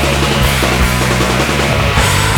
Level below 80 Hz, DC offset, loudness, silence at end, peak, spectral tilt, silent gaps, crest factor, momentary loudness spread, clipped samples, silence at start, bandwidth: -20 dBFS; under 0.1%; -12 LUFS; 0 s; 0 dBFS; -4 dB/octave; none; 12 dB; 1 LU; under 0.1%; 0 s; 20 kHz